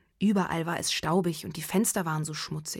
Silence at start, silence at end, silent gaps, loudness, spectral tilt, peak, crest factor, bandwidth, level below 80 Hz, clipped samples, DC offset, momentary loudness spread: 0.2 s; 0 s; none; -28 LUFS; -4.5 dB/octave; -14 dBFS; 16 dB; 17 kHz; -60 dBFS; under 0.1%; under 0.1%; 7 LU